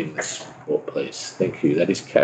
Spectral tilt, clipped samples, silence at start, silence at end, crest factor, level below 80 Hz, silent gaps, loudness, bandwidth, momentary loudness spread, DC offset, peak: -4.5 dB/octave; under 0.1%; 0 s; 0 s; 20 dB; -64 dBFS; none; -24 LUFS; 9.2 kHz; 9 LU; under 0.1%; -4 dBFS